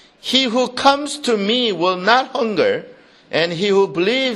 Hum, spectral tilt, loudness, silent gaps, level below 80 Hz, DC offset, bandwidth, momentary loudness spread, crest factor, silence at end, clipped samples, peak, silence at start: none; -3.5 dB/octave; -17 LUFS; none; -62 dBFS; under 0.1%; 12.5 kHz; 5 LU; 18 dB; 0 s; under 0.1%; 0 dBFS; 0.25 s